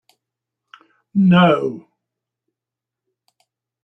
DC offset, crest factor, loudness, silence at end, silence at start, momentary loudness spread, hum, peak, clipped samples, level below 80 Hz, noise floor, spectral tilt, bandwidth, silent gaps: under 0.1%; 18 dB; -16 LUFS; 2.05 s; 1.15 s; 16 LU; none; -2 dBFS; under 0.1%; -60 dBFS; -86 dBFS; -9 dB/octave; 3.7 kHz; none